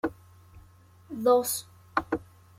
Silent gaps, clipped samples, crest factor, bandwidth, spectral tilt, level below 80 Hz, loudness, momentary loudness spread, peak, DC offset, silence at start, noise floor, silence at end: none; under 0.1%; 22 dB; 16 kHz; -3.5 dB/octave; -60 dBFS; -28 LUFS; 12 LU; -8 dBFS; under 0.1%; 0.05 s; -55 dBFS; 0.35 s